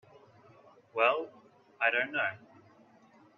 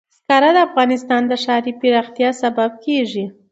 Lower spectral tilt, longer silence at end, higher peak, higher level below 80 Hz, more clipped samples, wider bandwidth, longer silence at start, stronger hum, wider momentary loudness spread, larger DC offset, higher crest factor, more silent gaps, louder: about the same, -5 dB/octave vs -4.5 dB/octave; first, 1 s vs 0.2 s; second, -12 dBFS vs 0 dBFS; second, -86 dBFS vs -70 dBFS; neither; second, 7 kHz vs 8 kHz; first, 0.95 s vs 0.3 s; neither; first, 16 LU vs 7 LU; neither; first, 24 dB vs 16 dB; neither; second, -30 LUFS vs -16 LUFS